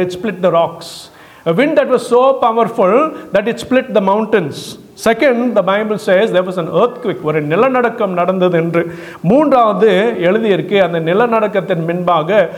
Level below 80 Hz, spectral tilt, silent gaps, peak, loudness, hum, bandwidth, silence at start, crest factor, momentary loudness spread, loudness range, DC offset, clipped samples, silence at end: -54 dBFS; -6.5 dB/octave; none; -2 dBFS; -13 LUFS; none; 15.5 kHz; 0 s; 12 dB; 7 LU; 2 LU; under 0.1%; under 0.1%; 0 s